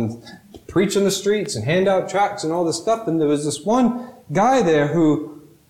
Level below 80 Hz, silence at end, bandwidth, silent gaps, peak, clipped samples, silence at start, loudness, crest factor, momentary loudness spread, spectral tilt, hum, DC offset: -54 dBFS; 0.3 s; 16 kHz; none; -8 dBFS; under 0.1%; 0 s; -19 LUFS; 12 dB; 8 LU; -5.5 dB/octave; none; under 0.1%